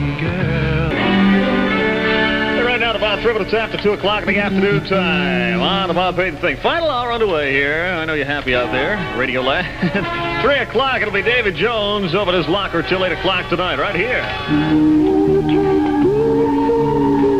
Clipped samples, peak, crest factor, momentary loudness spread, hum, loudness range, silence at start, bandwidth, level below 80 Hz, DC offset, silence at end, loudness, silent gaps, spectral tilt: under 0.1%; -4 dBFS; 14 dB; 4 LU; none; 2 LU; 0 s; 10.5 kHz; -36 dBFS; 0.4%; 0 s; -16 LUFS; none; -6.5 dB/octave